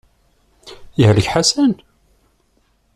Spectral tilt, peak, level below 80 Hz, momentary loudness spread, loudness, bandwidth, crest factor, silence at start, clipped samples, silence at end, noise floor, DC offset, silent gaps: -5 dB/octave; -2 dBFS; -44 dBFS; 12 LU; -15 LUFS; 13 kHz; 16 dB; 0.65 s; under 0.1%; 1.2 s; -60 dBFS; under 0.1%; none